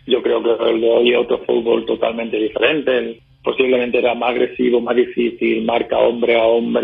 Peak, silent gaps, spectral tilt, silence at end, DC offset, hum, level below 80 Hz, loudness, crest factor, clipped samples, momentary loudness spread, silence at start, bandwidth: -2 dBFS; none; -8.5 dB/octave; 0 s; under 0.1%; none; -54 dBFS; -17 LUFS; 14 dB; under 0.1%; 6 LU; 0.05 s; 3.9 kHz